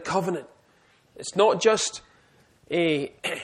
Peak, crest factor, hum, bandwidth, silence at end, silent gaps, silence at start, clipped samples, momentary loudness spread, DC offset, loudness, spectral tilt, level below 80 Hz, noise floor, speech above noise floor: -6 dBFS; 20 dB; none; 14 kHz; 0 s; none; 0 s; under 0.1%; 14 LU; under 0.1%; -24 LUFS; -3.5 dB/octave; -66 dBFS; -61 dBFS; 37 dB